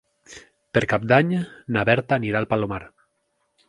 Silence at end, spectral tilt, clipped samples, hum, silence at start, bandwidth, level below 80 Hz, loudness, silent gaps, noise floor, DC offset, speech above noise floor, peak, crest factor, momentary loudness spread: 0.8 s; -7 dB/octave; under 0.1%; none; 0.3 s; 11 kHz; -52 dBFS; -22 LUFS; none; -72 dBFS; under 0.1%; 50 dB; -2 dBFS; 22 dB; 9 LU